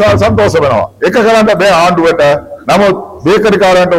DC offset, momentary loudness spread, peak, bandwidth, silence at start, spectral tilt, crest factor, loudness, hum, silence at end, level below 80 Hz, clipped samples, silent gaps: under 0.1%; 5 LU; -2 dBFS; 16 kHz; 0 s; -5.5 dB/octave; 6 dB; -8 LUFS; none; 0 s; -34 dBFS; under 0.1%; none